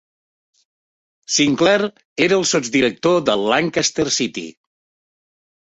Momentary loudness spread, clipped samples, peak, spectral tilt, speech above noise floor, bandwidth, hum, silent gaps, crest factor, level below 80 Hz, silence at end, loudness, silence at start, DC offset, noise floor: 8 LU; under 0.1%; -2 dBFS; -3 dB/octave; over 72 dB; 8.4 kHz; none; 2.05-2.16 s; 18 dB; -56 dBFS; 1.2 s; -17 LUFS; 1.3 s; under 0.1%; under -90 dBFS